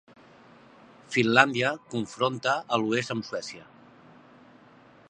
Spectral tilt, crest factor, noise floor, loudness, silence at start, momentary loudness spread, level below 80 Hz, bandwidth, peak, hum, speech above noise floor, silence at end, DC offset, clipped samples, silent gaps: -4.5 dB/octave; 28 dB; -55 dBFS; -26 LUFS; 1.1 s; 15 LU; -72 dBFS; 10.5 kHz; -2 dBFS; none; 28 dB; 1.45 s; under 0.1%; under 0.1%; none